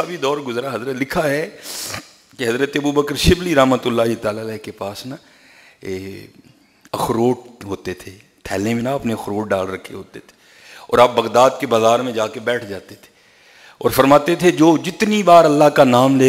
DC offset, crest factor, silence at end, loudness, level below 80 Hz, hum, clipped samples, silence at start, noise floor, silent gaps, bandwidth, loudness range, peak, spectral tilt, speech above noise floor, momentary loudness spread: under 0.1%; 18 dB; 0 s; -16 LUFS; -40 dBFS; none; under 0.1%; 0 s; -49 dBFS; none; 16 kHz; 10 LU; 0 dBFS; -5 dB/octave; 32 dB; 18 LU